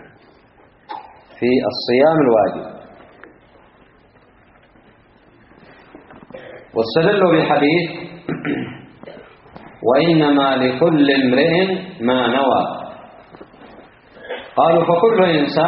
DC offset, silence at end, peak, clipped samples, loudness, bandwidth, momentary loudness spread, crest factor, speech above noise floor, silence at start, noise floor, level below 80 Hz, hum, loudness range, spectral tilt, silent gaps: under 0.1%; 0 s; 0 dBFS; under 0.1%; -16 LUFS; 5.6 kHz; 21 LU; 18 dB; 36 dB; 0.9 s; -51 dBFS; -56 dBFS; none; 5 LU; -4 dB/octave; none